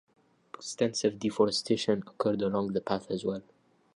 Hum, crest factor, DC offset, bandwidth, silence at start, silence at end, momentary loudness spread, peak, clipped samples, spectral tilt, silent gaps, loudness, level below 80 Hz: none; 20 dB; under 0.1%; 11 kHz; 0.6 s; 0.55 s; 13 LU; -12 dBFS; under 0.1%; -5 dB/octave; none; -30 LUFS; -66 dBFS